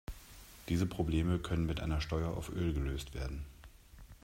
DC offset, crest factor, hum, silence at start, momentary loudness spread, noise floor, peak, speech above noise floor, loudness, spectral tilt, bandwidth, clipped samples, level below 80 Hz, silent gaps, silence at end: under 0.1%; 16 dB; none; 0.1 s; 17 LU; -55 dBFS; -20 dBFS; 21 dB; -36 LUFS; -6.5 dB/octave; 16 kHz; under 0.1%; -44 dBFS; none; 0.1 s